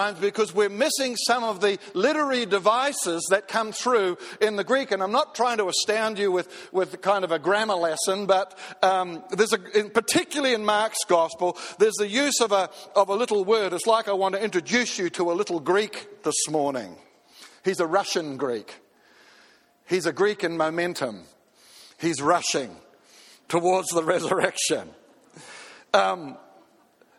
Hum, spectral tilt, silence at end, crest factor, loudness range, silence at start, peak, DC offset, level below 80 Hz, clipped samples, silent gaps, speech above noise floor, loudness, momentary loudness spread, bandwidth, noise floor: none; -2.5 dB/octave; 0.8 s; 20 dB; 5 LU; 0 s; -4 dBFS; under 0.1%; -72 dBFS; under 0.1%; none; 35 dB; -24 LUFS; 7 LU; 16 kHz; -59 dBFS